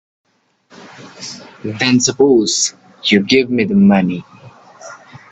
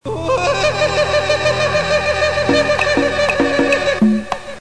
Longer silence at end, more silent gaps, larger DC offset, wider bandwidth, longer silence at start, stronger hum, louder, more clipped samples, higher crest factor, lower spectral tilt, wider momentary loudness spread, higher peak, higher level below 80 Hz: first, 0.15 s vs 0 s; neither; second, under 0.1% vs 1%; second, 9 kHz vs 11 kHz; first, 0.8 s vs 0 s; neither; about the same, -13 LUFS vs -15 LUFS; neither; first, 16 dB vs 10 dB; about the same, -4 dB/octave vs -4.5 dB/octave; first, 19 LU vs 2 LU; first, 0 dBFS vs -4 dBFS; second, -56 dBFS vs -38 dBFS